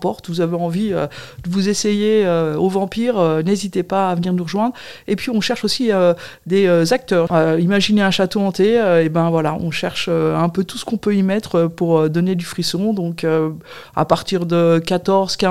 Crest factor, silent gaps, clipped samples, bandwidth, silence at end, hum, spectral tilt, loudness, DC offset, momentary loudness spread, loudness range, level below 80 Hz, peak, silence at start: 16 dB; none; under 0.1%; 14.5 kHz; 0 s; none; -6 dB/octave; -17 LUFS; 0.6%; 7 LU; 3 LU; -52 dBFS; 0 dBFS; 0 s